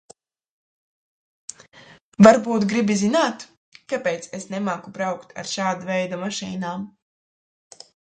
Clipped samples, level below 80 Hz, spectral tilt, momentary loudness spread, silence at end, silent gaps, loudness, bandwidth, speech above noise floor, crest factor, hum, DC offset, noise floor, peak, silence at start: under 0.1%; -64 dBFS; -5 dB/octave; 25 LU; 1.25 s; 3.57-3.72 s; -21 LUFS; 9.2 kHz; 29 dB; 24 dB; none; under 0.1%; -50 dBFS; 0 dBFS; 2.2 s